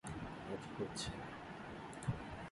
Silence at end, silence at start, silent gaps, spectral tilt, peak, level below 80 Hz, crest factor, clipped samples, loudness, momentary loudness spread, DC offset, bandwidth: 0 s; 0.05 s; none; -5 dB/octave; -26 dBFS; -60 dBFS; 20 dB; under 0.1%; -46 LUFS; 6 LU; under 0.1%; 11.5 kHz